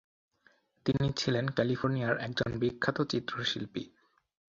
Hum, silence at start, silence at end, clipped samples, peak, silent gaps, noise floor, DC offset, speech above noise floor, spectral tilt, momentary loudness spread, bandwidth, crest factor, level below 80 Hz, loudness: none; 0.85 s; 0.7 s; under 0.1%; -12 dBFS; none; -68 dBFS; under 0.1%; 37 dB; -6 dB/octave; 7 LU; 7.6 kHz; 22 dB; -60 dBFS; -32 LUFS